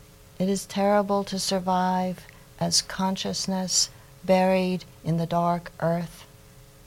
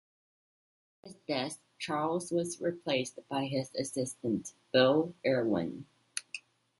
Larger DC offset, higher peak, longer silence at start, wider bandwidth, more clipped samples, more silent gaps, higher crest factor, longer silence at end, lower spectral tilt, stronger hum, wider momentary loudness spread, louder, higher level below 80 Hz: neither; about the same, -10 dBFS vs -12 dBFS; second, 0.4 s vs 1.05 s; first, 17 kHz vs 11.5 kHz; neither; neither; second, 16 dB vs 22 dB; second, 0.25 s vs 0.4 s; about the same, -4 dB/octave vs -4.5 dB/octave; neither; second, 8 LU vs 14 LU; first, -25 LUFS vs -33 LUFS; first, -54 dBFS vs -72 dBFS